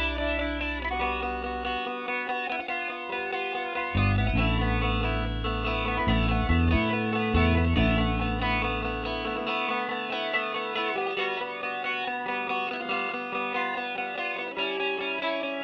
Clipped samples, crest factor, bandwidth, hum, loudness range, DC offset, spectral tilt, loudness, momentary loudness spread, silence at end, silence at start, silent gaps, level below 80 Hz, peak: under 0.1%; 16 dB; 6.4 kHz; none; 4 LU; under 0.1%; -8 dB/octave; -28 LUFS; 6 LU; 0 s; 0 s; none; -36 dBFS; -12 dBFS